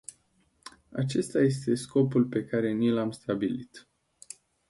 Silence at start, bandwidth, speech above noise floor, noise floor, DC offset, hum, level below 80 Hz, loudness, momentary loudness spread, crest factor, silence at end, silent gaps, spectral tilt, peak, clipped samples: 0.65 s; 11.5 kHz; 41 dB; -68 dBFS; under 0.1%; none; -66 dBFS; -28 LUFS; 21 LU; 16 dB; 0.9 s; none; -6.5 dB/octave; -12 dBFS; under 0.1%